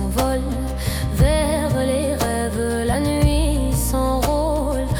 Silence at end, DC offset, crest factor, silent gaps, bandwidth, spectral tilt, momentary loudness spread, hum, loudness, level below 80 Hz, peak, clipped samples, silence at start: 0 s; under 0.1%; 14 dB; none; 18 kHz; -5.5 dB/octave; 5 LU; none; -20 LUFS; -24 dBFS; -6 dBFS; under 0.1%; 0 s